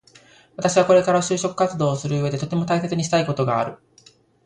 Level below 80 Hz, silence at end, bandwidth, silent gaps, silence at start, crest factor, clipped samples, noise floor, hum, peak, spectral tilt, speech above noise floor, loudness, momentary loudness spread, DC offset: -58 dBFS; 0.7 s; 11 kHz; none; 0.6 s; 18 dB; under 0.1%; -54 dBFS; none; -4 dBFS; -5.5 dB/octave; 34 dB; -21 LUFS; 9 LU; under 0.1%